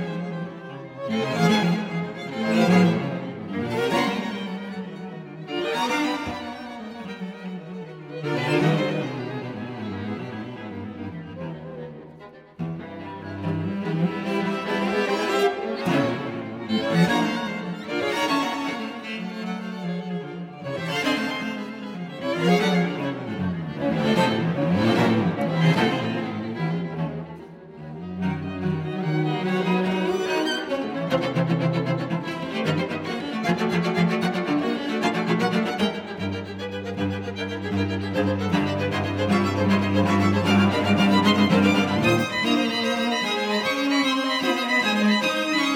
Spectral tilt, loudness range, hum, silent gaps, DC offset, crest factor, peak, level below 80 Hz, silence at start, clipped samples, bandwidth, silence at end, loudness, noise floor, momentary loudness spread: -6 dB/octave; 9 LU; none; none; under 0.1%; 18 dB; -6 dBFS; -60 dBFS; 0 s; under 0.1%; 16 kHz; 0 s; -24 LUFS; -45 dBFS; 15 LU